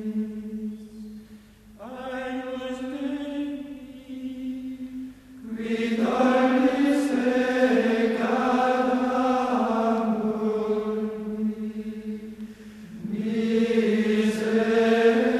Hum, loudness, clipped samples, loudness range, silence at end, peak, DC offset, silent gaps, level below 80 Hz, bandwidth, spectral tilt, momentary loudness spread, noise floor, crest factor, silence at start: 50 Hz at -60 dBFS; -25 LUFS; under 0.1%; 12 LU; 0 s; -8 dBFS; under 0.1%; none; -60 dBFS; 13 kHz; -6 dB/octave; 18 LU; -49 dBFS; 16 dB; 0 s